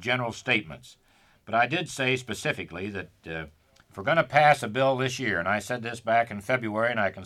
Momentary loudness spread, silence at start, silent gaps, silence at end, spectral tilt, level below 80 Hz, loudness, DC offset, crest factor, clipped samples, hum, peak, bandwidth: 16 LU; 0 s; none; 0 s; -4.5 dB/octave; -62 dBFS; -26 LUFS; under 0.1%; 20 dB; under 0.1%; none; -6 dBFS; 14.5 kHz